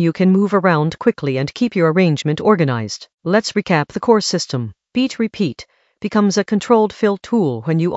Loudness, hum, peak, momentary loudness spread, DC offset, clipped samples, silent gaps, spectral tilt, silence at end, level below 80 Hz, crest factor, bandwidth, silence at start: -17 LUFS; none; 0 dBFS; 9 LU; under 0.1%; under 0.1%; 3.14-3.18 s; -6 dB/octave; 0 s; -56 dBFS; 16 dB; 8.2 kHz; 0 s